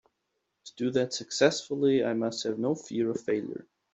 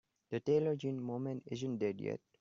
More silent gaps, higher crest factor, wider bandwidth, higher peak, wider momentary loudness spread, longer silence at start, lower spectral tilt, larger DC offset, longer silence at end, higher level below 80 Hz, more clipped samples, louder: neither; about the same, 20 dB vs 16 dB; first, 8.2 kHz vs 7.4 kHz; first, -8 dBFS vs -20 dBFS; about the same, 8 LU vs 9 LU; first, 0.65 s vs 0.3 s; second, -4.5 dB/octave vs -7.5 dB/octave; neither; about the same, 0.3 s vs 0.25 s; about the same, -72 dBFS vs -76 dBFS; neither; first, -29 LUFS vs -38 LUFS